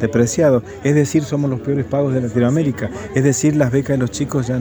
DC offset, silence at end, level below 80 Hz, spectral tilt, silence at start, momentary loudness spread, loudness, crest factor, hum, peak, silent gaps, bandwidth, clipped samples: under 0.1%; 0 s; -44 dBFS; -6.5 dB/octave; 0 s; 5 LU; -17 LUFS; 14 dB; none; -2 dBFS; none; over 20 kHz; under 0.1%